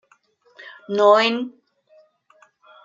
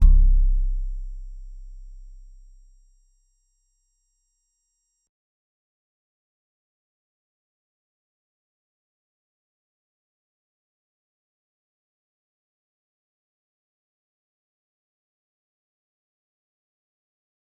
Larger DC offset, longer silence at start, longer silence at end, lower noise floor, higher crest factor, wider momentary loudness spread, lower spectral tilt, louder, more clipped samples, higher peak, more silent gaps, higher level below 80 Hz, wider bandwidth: neither; first, 0.6 s vs 0 s; second, 1.35 s vs 15.9 s; second, -60 dBFS vs -75 dBFS; about the same, 20 dB vs 24 dB; about the same, 26 LU vs 27 LU; second, -4 dB/octave vs -8.5 dB/octave; first, -18 LUFS vs -25 LUFS; neither; about the same, -2 dBFS vs -2 dBFS; neither; second, -80 dBFS vs -28 dBFS; first, 7.6 kHz vs 1.1 kHz